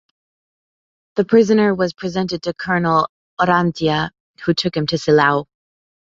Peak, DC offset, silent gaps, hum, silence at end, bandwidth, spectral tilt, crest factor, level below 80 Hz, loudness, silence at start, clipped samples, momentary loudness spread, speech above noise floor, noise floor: -2 dBFS; under 0.1%; 3.09-3.37 s, 4.20-4.34 s; none; 0.7 s; 7.8 kHz; -6 dB/octave; 18 dB; -52 dBFS; -18 LUFS; 1.15 s; under 0.1%; 9 LU; over 73 dB; under -90 dBFS